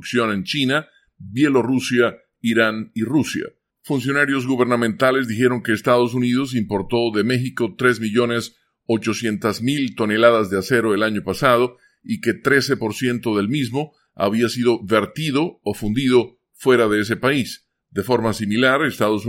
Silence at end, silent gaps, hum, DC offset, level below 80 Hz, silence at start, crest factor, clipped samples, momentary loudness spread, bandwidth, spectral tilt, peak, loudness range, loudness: 0 s; none; none; under 0.1%; -54 dBFS; 0 s; 18 dB; under 0.1%; 8 LU; 16.5 kHz; -5.5 dB/octave; 0 dBFS; 2 LU; -19 LUFS